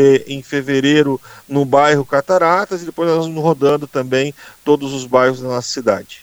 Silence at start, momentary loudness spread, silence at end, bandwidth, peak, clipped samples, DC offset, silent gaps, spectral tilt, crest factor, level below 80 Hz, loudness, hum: 0 s; 9 LU; 0.05 s; over 20 kHz; 0 dBFS; under 0.1%; under 0.1%; none; -5.5 dB/octave; 16 dB; -58 dBFS; -16 LUFS; none